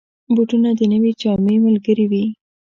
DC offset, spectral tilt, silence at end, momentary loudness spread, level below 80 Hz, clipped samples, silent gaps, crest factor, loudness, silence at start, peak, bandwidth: under 0.1%; -8.5 dB/octave; 0.25 s; 5 LU; -54 dBFS; under 0.1%; none; 12 dB; -16 LUFS; 0.3 s; -4 dBFS; 7 kHz